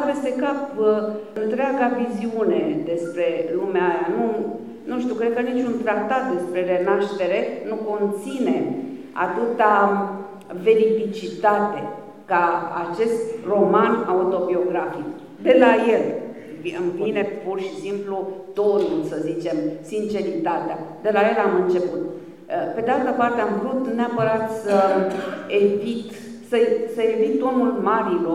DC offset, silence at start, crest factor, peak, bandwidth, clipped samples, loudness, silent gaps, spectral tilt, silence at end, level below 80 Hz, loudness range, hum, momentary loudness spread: 0.2%; 0 s; 20 dB; -2 dBFS; 12.5 kHz; under 0.1%; -22 LUFS; none; -6.5 dB/octave; 0 s; -68 dBFS; 3 LU; none; 11 LU